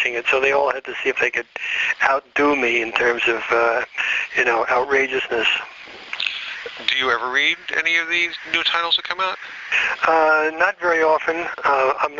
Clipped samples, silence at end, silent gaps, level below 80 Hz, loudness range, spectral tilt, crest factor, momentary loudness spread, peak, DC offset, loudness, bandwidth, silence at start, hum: under 0.1%; 0 s; none; -58 dBFS; 2 LU; 1.5 dB/octave; 20 dB; 7 LU; 0 dBFS; under 0.1%; -19 LUFS; 7.6 kHz; 0 s; none